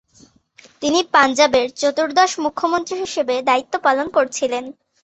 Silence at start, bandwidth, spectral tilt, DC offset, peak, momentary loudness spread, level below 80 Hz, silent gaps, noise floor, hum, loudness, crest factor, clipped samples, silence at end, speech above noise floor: 0.8 s; 8.4 kHz; -2 dB/octave; under 0.1%; -2 dBFS; 9 LU; -58 dBFS; none; -52 dBFS; none; -18 LUFS; 18 dB; under 0.1%; 0.3 s; 34 dB